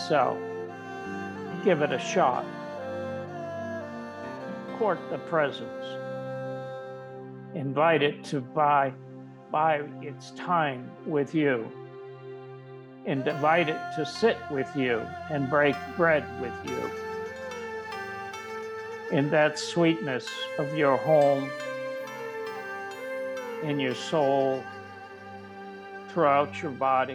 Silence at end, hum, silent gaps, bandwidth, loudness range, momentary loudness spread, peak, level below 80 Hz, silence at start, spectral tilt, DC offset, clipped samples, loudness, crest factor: 0 s; none; none; 15 kHz; 6 LU; 17 LU; -10 dBFS; -70 dBFS; 0 s; -5.5 dB/octave; under 0.1%; under 0.1%; -28 LUFS; 18 dB